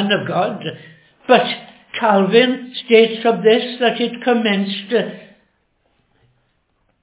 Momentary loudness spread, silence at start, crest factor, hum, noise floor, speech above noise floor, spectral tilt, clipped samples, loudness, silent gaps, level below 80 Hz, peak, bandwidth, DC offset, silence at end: 15 LU; 0 s; 18 dB; none; -64 dBFS; 49 dB; -9 dB/octave; under 0.1%; -16 LUFS; none; -70 dBFS; 0 dBFS; 4 kHz; under 0.1%; 1.8 s